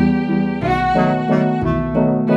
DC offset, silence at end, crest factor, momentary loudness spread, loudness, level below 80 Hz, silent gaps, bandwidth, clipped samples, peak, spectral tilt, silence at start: under 0.1%; 0 s; 12 dB; 3 LU; -17 LUFS; -34 dBFS; none; 7.8 kHz; under 0.1%; -4 dBFS; -9 dB/octave; 0 s